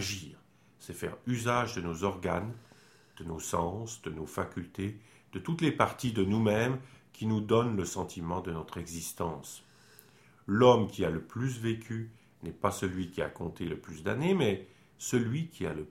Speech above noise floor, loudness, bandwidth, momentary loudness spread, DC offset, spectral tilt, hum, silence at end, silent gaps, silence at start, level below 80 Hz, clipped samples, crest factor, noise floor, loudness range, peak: 28 dB; -32 LUFS; 16 kHz; 15 LU; under 0.1%; -5.5 dB/octave; none; 0 s; none; 0 s; -58 dBFS; under 0.1%; 24 dB; -60 dBFS; 5 LU; -8 dBFS